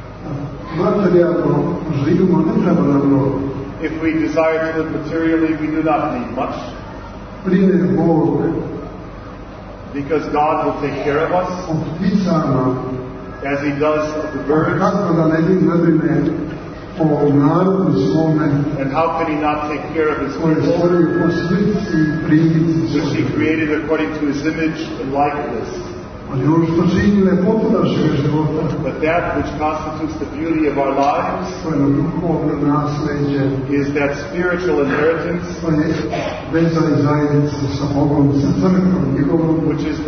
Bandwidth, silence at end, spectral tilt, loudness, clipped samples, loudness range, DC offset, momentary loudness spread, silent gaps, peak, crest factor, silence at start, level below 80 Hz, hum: 6.6 kHz; 0 s; -8 dB/octave; -17 LUFS; under 0.1%; 3 LU; under 0.1%; 10 LU; none; -2 dBFS; 14 dB; 0 s; -38 dBFS; none